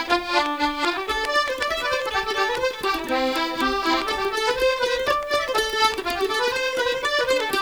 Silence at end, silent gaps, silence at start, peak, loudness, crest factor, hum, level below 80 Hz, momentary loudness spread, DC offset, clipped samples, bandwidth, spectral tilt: 0 s; none; 0 s; -6 dBFS; -22 LUFS; 18 dB; none; -46 dBFS; 3 LU; 0.2%; under 0.1%; over 20 kHz; -2 dB/octave